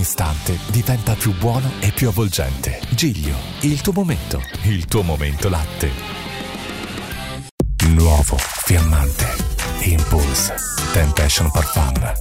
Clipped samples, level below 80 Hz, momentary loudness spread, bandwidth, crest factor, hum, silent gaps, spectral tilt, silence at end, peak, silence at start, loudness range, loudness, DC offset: under 0.1%; -24 dBFS; 11 LU; 16.5 kHz; 14 dB; none; 7.51-7.58 s; -4.5 dB/octave; 0 s; -4 dBFS; 0 s; 5 LU; -19 LUFS; under 0.1%